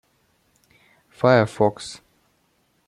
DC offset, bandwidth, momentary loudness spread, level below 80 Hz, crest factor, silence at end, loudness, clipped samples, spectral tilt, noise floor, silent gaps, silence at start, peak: under 0.1%; 12.5 kHz; 19 LU; -62 dBFS; 22 dB; 0.95 s; -19 LUFS; under 0.1%; -6.5 dB/octave; -66 dBFS; none; 1.25 s; -2 dBFS